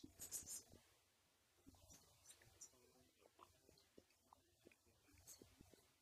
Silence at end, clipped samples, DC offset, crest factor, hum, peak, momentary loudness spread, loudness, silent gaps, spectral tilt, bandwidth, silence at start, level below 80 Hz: 0 s; under 0.1%; under 0.1%; 28 dB; none; -36 dBFS; 17 LU; -58 LUFS; none; -1.5 dB/octave; 15.5 kHz; 0 s; -82 dBFS